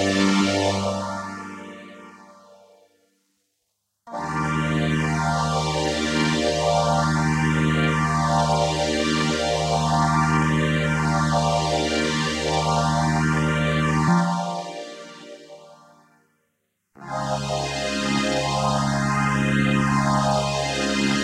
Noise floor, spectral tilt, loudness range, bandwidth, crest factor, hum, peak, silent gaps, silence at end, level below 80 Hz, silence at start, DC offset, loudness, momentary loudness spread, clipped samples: -75 dBFS; -5 dB/octave; 10 LU; 12.5 kHz; 16 dB; none; -8 dBFS; none; 0 s; -42 dBFS; 0 s; under 0.1%; -22 LUFS; 12 LU; under 0.1%